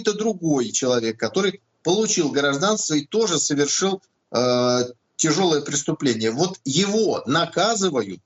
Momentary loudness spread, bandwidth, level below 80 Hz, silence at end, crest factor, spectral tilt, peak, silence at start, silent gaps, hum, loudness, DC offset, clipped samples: 4 LU; 8.4 kHz; -66 dBFS; 0.1 s; 14 dB; -3.5 dB/octave; -6 dBFS; 0 s; none; none; -21 LUFS; under 0.1%; under 0.1%